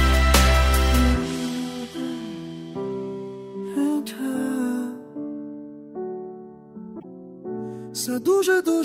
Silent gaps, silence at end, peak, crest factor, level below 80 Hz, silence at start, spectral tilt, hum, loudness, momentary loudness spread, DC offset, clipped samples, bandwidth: none; 0 s; -2 dBFS; 20 dB; -28 dBFS; 0 s; -5 dB/octave; none; -24 LUFS; 20 LU; under 0.1%; under 0.1%; 16 kHz